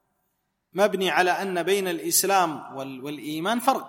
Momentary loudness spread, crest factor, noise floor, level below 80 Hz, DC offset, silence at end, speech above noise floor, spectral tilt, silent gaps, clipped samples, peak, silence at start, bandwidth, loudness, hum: 14 LU; 18 dB; -76 dBFS; -78 dBFS; under 0.1%; 0 s; 51 dB; -2.5 dB/octave; none; under 0.1%; -6 dBFS; 0.75 s; 16.5 kHz; -23 LUFS; none